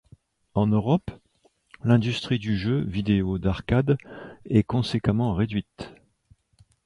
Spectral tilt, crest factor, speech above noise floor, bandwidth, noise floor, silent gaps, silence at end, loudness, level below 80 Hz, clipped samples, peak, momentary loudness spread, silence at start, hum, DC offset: -8 dB/octave; 18 dB; 37 dB; 11 kHz; -61 dBFS; none; 0.95 s; -25 LUFS; -44 dBFS; under 0.1%; -6 dBFS; 17 LU; 0.55 s; none; under 0.1%